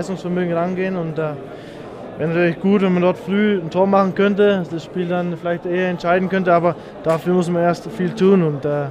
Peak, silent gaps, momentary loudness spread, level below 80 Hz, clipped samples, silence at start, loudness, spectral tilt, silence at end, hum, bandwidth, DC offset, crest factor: -2 dBFS; none; 10 LU; -54 dBFS; under 0.1%; 0 s; -18 LUFS; -7.5 dB/octave; 0 s; none; 10.5 kHz; under 0.1%; 16 dB